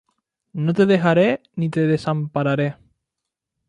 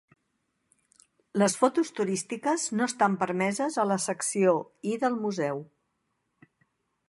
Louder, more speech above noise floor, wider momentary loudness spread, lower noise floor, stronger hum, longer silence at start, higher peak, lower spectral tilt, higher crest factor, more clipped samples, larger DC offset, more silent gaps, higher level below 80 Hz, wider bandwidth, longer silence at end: first, -20 LUFS vs -27 LUFS; first, 64 dB vs 51 dB; first, 9 LU vs 6 LU; first, -83 dBFS vs -78 dBFS; neither; second, 0.55 s vs 1.35 s; first, -4 dBFS vs -8 dBFS; first, -8 dB/octave vs -4.5 dB/octave; second, 16 dB vs 22 dB; neither; neither; neither; first, -60 dBFS vs -80 dBFS; second, 10 kHz vs 11.5 kHz; second, 0.95 s vs 1.45 s